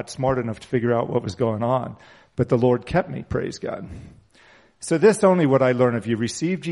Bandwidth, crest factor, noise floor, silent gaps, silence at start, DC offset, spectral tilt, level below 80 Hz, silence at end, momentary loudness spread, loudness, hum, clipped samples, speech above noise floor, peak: 11.5 kHz; 18 dB; -54 dBFS; none; 0 s; under 0.1%; -6.5 dB/octave; -50 dBFS; 0 s; 15 LU; -22 LUFS; none; under 0.1%; 32 dB; -4 dBFS